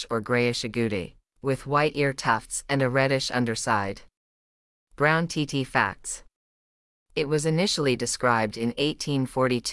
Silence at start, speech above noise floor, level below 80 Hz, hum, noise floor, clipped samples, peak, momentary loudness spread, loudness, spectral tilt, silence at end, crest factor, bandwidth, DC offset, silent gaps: 0 s; over 65 dB; -54 dBFS; none; under -90 dBFS; under 0.1%; -6 dBFS; 10 LU; -25 LUFS; -4.5 dB/octave; 0 s; 20 dB; 12 kHz; under 0.1%; 4.17-4.87 s, 6.36-7.06 s